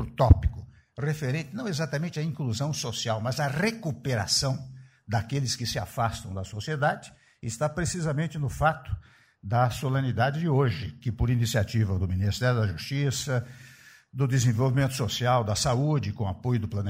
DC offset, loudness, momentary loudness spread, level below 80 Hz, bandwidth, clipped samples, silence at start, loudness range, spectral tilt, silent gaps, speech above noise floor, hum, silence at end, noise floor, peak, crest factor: under 0.1%; -27 LUFS; 11 LU; -40 dBFS; 16 kHz; under 0.1%; 0 s; 3 LU; -5.5 dB/octave; none; 26 dB; none; 0 s; -52 dBFS; -6 dBFS; 22 dB